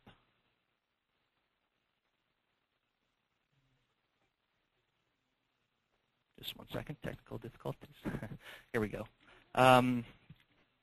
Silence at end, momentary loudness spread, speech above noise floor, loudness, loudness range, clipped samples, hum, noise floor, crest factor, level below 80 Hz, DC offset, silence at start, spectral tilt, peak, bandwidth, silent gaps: 0.7 s; 23 LU; 49 dB; -34 LUFS; 17 LU; under 0.1%; none; -84 dBFS; 28 dB; -64 dBFS; under 0.1%; 6.4 s; -5.5 dB/octave; -12 dBFS; 13 kHz; none